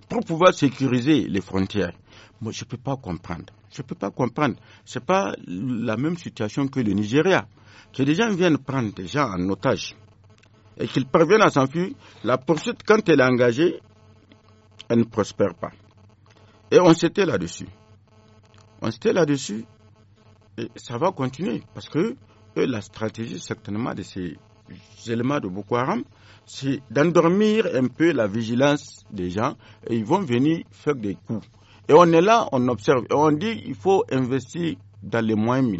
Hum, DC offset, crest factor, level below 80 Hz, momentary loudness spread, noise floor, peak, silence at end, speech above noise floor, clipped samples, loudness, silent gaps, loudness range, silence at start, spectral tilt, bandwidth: none; under 0.1%; 20 dB; -58 dBFS; 16 LU; -54 dBFS; -2 dBFS; 0 s; 32 dB; under 0.1%; -22 LUFS; none; 9 LU; 0.1 s; -5.5 dB/octave; 8 kHz